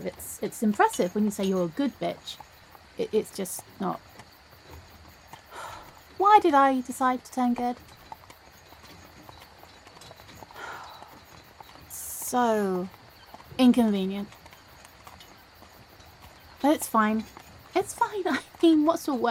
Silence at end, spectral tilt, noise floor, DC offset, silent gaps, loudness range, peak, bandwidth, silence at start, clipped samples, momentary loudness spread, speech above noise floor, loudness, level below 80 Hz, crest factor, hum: 0 s; -5 dB/octave; -52 dBFS; under 0.1%; none; 15 LU; -6 dBFS; 17.5 kHz; 0 s; under 0.1%; 27 LU; 27 dB; -26 LUFS; -60 dBFS; 22 dB; none